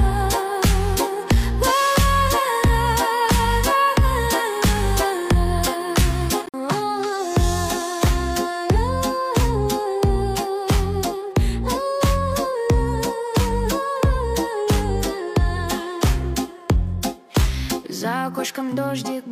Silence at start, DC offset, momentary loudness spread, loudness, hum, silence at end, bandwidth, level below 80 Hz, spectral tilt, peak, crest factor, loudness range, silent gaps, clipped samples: 0 s; under 0.1%; 6 LU; -21 LUFS; none; 0 s; 16 kHz; -24 dBFS; -5 dB/octave; -8 dBFS; 12 dB; 4 LU; none; under 0.1%